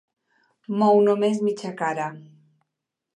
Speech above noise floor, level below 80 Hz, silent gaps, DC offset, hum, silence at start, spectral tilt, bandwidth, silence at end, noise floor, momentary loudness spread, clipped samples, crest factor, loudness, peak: 62 dB; -76 dBFS; none; under 0.1%; none; 0.7 s; -6.5 dB/octave; 11 kHz; 0.95 s; -84 dBFS; 13 LU; under 0.1%; 16 dB; -22 LUFS; -8 dBFS